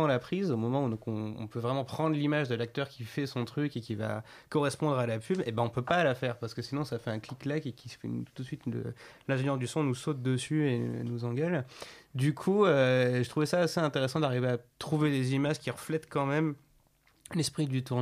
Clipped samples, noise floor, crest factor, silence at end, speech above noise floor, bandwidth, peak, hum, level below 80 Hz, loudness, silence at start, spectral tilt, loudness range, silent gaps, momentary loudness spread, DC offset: under 0.1%; -67 dBFS; 18 dB; 0 s; 36 dB; 15 kHz; -12 dBFS; none; -68 dBFS; -31 LUFS; 0 s; -6.5 dB/octave; 5 LU; none; 10 LU; under 0.1%